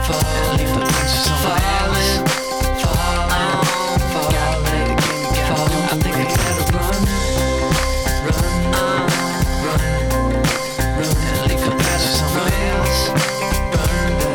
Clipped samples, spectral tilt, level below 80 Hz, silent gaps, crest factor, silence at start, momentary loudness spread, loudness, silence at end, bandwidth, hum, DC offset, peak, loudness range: under 0.1%; -4.5 dB/octave; -24 dBFS; none; 10 dB; 0 s; 3 LU; -18 LUFS; 0 s; over 20 kHz; none; under 0.1%; -8 dBFS; 1 LU